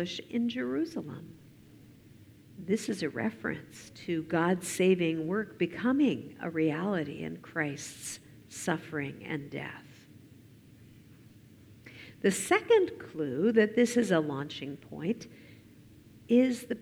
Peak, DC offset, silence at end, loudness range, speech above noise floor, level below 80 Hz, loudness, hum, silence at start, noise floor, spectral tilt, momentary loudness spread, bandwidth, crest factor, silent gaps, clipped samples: -12 dBFS; under 0.1%; 0 s; 11 LU; 25 dB; -70 dBFS; -31 LUFS; none; 0 s; -55 dBFS; -5 dB/octave; 17 LU; 17.5 kHz; 20 dB; none; under 0.1%